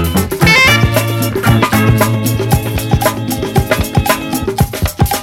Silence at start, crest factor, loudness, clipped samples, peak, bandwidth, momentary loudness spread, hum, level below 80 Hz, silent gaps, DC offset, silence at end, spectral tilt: 0 s; 12 dB; -12 LUFS; 0.2%; 0 dBFS; 17 kHz; 8 LU; none; -24 dBFS; none; under 0.1%; 0 s; -5 dB/octave